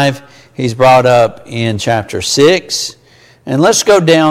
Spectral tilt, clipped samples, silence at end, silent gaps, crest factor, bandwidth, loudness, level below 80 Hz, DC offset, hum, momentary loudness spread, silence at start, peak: -4 dB/octave; under 0.1%; 0 s; none; 12 dB; 16.5 kHz; -11 LUFS; -46 dBFS; under 0.1%; none; 11 LU; 0 s; 0 dBFS